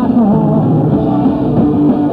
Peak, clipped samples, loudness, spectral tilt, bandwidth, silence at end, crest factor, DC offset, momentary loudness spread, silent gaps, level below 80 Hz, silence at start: 0 dBFS; under 0.1%; -11 LUFS; -11.5 dB/octave; 4.7 kHz; 0 s; 10 dB; under 0.1%; 2 LU; none; -34 dBFS; 0 s